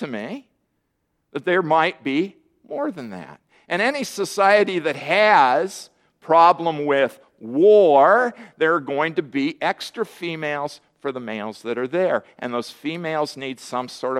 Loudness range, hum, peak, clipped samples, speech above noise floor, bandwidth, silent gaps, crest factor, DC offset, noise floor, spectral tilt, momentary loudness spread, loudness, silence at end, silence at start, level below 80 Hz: 9 LU; none; -2 dBFS; under 0.1%; 52 dB; 14.5 kHz; none; 18 dB; under 0.1%; -72 dBFS; -4.5 dB/octave; 16 LU; -20 LUFS; 0 s; 0 s; -74 dBFS